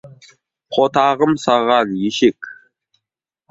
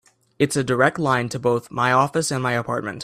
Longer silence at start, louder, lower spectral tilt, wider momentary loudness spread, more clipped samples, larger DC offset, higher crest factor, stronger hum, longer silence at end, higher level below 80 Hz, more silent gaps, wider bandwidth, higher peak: second, 0.05 s vs 0.4 s; first, -16 LUFS vs -21 LUFS; about the same, -5 dB/octave vs -5 dB/octave; first, 9 LU vs 5 LU; neither; neither; about the same, 18 dB vs 20 dB; neither; first, 0.95 s vs 0 s; about the same, -58 dBFS vs -58 dBFS; neither; second, 8 kHz vs 15 kHz; about the same, -2 dBFS vs -2 dBFS